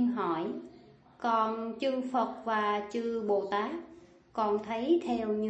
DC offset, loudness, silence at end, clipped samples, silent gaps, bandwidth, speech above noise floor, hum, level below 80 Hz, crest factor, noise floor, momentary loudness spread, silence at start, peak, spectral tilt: under 0.1%; -32 LUFS; 0 s; under 0.1%; none; 8.4 kHz; 25 dB; none; -70 dBFS; 16 dB; -56 dBFS; 10 LU; 0 s; -16 dBFS; -6 dB/octave